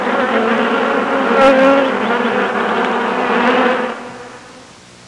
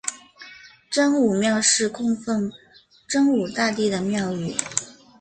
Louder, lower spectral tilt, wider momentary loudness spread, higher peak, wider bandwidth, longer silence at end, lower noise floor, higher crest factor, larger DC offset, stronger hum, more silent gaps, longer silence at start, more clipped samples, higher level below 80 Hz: first, -14 LUFS vs -22 LUFS; first, -5 dB/octave vs -3.5 dB/octave; second, 12 LU vs 19 LU; about the same, -2 dBFS vs -2 dBFS; first, 11 kHz vs 9.8 kHz; first, 0.45 s vs 0.3 s; second, -39 dBFS vs -46 dBFS; second, 12 dB vs 20 dB; neither; neither; neither; about the same, 0 s vs 0.05 s; neither; first, -54 dBFS vs -62 dBFS